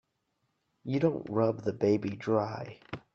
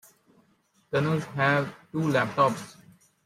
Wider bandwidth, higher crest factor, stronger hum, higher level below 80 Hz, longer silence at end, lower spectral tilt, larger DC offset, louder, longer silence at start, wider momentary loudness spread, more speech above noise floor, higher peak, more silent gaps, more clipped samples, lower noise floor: second, 7.2 kHz vs 15.5 kHz; about the same, 20 dB vs 20 dB; neither; about the same, -70 dBFS vs -68 dBFS; second, 0.15 s vs 0.55 s; first, -8.5 dB/octave vs -6.5 dB/octave; neither; second, -30 LUFS vs -26 LUFS; about the same, 0.85 s vs 0.9 s; first, 14 LU vs 9 LU; first, 49 dB vs 41 dB; second, -12 dBFS vs -8 dBFS; neither; neither; first, -79 dBFS vs -67 dBFS